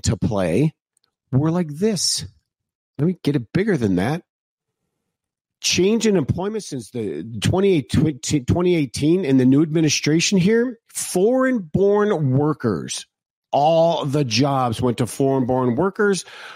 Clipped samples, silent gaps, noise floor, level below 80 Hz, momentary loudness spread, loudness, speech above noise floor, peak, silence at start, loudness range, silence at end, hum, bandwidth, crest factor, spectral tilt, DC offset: under 0.1%; 2.75-2.93 s, 4.30-4.58 s, 13.26-13.42 s; -84 dBFS; -46 dBFS; 9 LU; -20 LUFS; 65 dB; -8 dBFS; 0.05 s; 5 LU; 0 s; none; 16 kHz; 12 dB; -5.5 dB/octave; under 0.1%